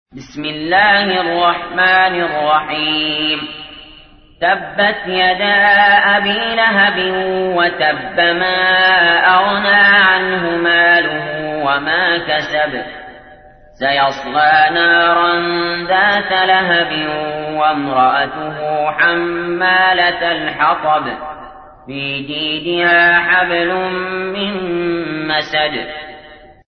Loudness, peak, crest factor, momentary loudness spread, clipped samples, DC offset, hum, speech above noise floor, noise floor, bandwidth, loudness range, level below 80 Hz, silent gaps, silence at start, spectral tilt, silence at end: -13 LUFS; 0 dBFS; 14 dB; 11 LU; under 0.1%; under 0.1%; none; 28 dB; -42 dBFS; 6.4 kHz; 5 LU; -48 dBFS; none; 0.15 s; -5.5 dB/octave; 0.35 s